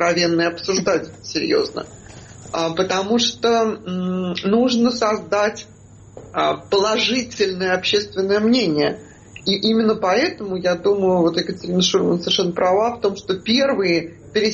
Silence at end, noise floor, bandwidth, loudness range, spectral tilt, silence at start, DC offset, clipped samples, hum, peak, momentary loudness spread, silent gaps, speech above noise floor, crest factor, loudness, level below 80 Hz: 0 s; -41 dBFS; 8.2 kHz; 3 LU; -4.5 dB/octave; 0 s; under 0.1%; under 0.1%; none; -4 dBFS; 7 LU; none; 23 dB; 14 dB; -19 LUFS; -54 dBFS